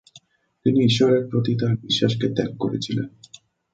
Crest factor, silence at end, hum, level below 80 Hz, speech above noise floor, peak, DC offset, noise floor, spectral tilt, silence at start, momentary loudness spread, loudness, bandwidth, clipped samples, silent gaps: 18 dB; 0.65 s; none; -56 dBFS; 33 dB; -4 dBFS; under 0.1%; -54 dBFS; -6.5 dB/octave; 0.15 s; 9 LU; -21 LUFS; 9 kHz; under 0.1%; none